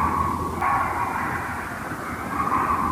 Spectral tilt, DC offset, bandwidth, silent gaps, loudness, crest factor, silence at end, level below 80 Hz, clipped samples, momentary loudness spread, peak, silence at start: -5.5 dB/octave; under 0.1%; 15.5 kHz; none; -25 LUFS; 14 dB; 0 s; -42 dBFS; under 0.1%; 8 LU; -10 dBFS; 0 s